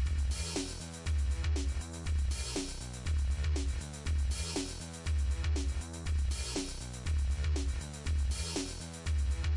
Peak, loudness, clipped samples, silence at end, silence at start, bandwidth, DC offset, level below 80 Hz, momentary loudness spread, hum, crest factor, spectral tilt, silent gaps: -24 dBFS; -36 LUFS; under 0.1%; 0 s; 0 s; 11.5 kHz; under 0.1%; -36 dBFS; 7 LU; none; 10 dB; -4.5 dB/octave; none